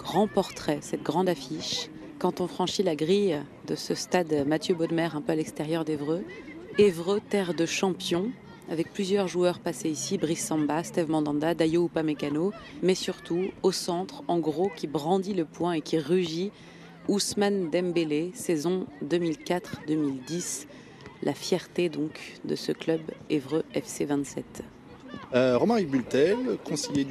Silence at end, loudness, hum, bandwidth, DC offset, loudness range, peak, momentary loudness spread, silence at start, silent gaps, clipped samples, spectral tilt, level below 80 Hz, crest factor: 0 s; -28 LUFS; none; 13.5 kHz; under 0.1%; 4 LU; -8 dBFS; 9 LU; 0 s; none; under 0.1%; -5 dB/octave; -64 dBFS; 20 dB